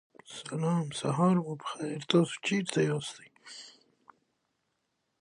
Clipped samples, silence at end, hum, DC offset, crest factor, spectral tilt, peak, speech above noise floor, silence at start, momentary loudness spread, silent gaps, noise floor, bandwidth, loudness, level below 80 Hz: under 0.1%; 1.5 s; none; under 0.1%; 22 dB; -5.5 dB/octave; -10 dBFS; 50 dB; 0.3 s; 20 LU; none; -80 dBFS; 11 kHz; -30 LUFS; -74 dBFS